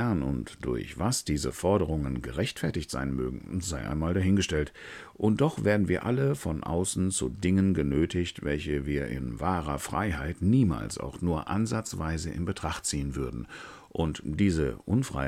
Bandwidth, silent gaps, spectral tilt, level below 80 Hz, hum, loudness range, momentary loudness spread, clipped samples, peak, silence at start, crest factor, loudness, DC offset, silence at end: 15.5 kHz; none; -5.5 dB/octave; -42 dBFS; none; 4 LU; 8 LU; under 0.1%; -10 dBFS; 0 s; 18 dB; -29 LUFS; under 0.1%; 0 s